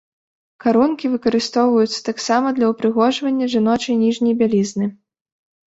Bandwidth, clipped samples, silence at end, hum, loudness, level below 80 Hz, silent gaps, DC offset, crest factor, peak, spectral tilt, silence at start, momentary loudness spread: 8 kHz; under 0.1%; 0.75 s; none; -18 LUFS; -60 dBFS; none; under 0.1%; 16 dB; -2 dBFS; -5 dB/octave; 0.65 s; 5 LU